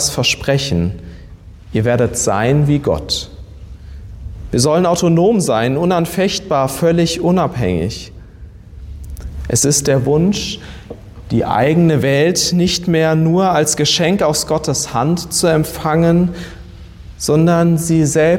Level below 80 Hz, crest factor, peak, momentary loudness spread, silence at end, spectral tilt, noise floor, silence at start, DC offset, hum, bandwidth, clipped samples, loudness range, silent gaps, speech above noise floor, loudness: -36 dBFS; 12 dB; -2 dBFS; 19 LU; 0 s; -5 dB/octave; -36 dBFS; 0 s; under 0.1%; none; 16.5 kHz; under 0.1%; 4 LU; none; 22 dB; -14 LUFS